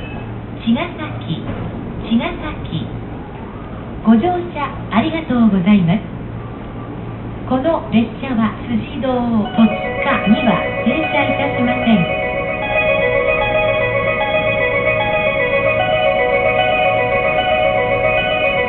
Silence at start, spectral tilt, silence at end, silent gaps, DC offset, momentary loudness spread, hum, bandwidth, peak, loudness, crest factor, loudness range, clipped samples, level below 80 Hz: 0 s; -11.5 dB/octave; 0 s; none; under 0.1%; 14 LU; none; 4.2 kHz; -2 dBFS; -16 LUFS; 14 dB; 6 LU; under 0.1%; -36 dBFS